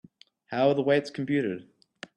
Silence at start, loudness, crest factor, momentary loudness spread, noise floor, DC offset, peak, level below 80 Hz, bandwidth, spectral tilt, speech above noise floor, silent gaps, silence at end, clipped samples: 0.5 s; -27 LUFS; 18 dB; 15 LU; -48 dBFS; under 0.1%; -10 dBFS; -72 dBFS; 10 kHz; -7 dB/octave; 22 dB; none; 0.55 s; under 0.1%